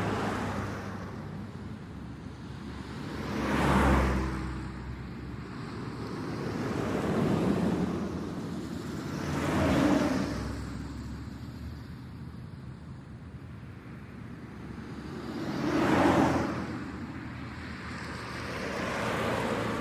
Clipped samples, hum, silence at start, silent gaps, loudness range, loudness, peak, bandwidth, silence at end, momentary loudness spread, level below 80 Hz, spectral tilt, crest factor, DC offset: under 0.1%; none; 0 s; none; 12 LU; -32 LUFS; -12 dBFS; 16 kHz; 0 s; 18 LU; -44 dBFS; -6.5 dB/octave; 20 dB; under 0.1%